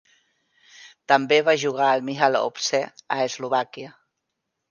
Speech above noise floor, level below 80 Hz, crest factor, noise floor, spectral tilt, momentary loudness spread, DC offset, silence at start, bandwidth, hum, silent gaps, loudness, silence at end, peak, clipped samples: 58 dB; -78 dBFS; 20 dB; -80 dBFS; -3 dB/octave; 15 LU; under 0.1%; 0.8 s; 10 kHz; none; none; -22 LUFS; 0.8 s; -4 dBFS; under 0.1%